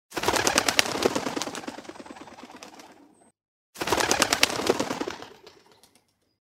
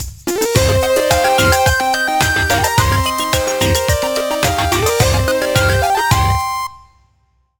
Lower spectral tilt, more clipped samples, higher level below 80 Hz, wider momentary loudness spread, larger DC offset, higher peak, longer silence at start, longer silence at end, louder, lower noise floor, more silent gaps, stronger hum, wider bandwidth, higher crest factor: second, -1.5 dB/octave vs -3.5 dB/octave; neither; second, -56 dBFS vs -28 dBFS; first, 23 LU vs 5 LU; neither; about the same, 0 dBFS vs 0 dBFS; about the same, 0.1 s vs 0 s; about the same, 0.9 s vs 0.8 s; second, -25 LUFS vs -14 LUFS; first, -66 dBFS vs -59 dBFS; first, 3.48-3.73 s vs none; neither; second, 16 kHz vs over 20 kHz; first, 28 dB vs 14 dB